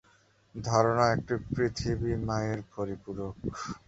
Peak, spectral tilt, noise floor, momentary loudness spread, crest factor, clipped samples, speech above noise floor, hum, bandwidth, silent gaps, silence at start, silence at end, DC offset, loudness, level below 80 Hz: -8 dBFS; -6 dB/octave; -64 dBFS; 12 LU; 22 dB; under 0.1%; 34 dB; none; 8 kHz; none; 0.55 s; 0.1 s; under 0.1%; -30 LUFS; -48 dBFS